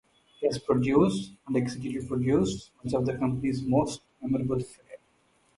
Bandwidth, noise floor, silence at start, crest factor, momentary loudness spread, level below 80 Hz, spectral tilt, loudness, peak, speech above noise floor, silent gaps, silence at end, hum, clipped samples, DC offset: 11.5 kHz; -67 dBFS; 0.4 s; 18 dB; 10 LU; -54 dBFS; -7 dB/octave; -28 LUFS; -10 dBFS; 39 dB; none; 0.6 s; none; under 0.1%; under 0.1%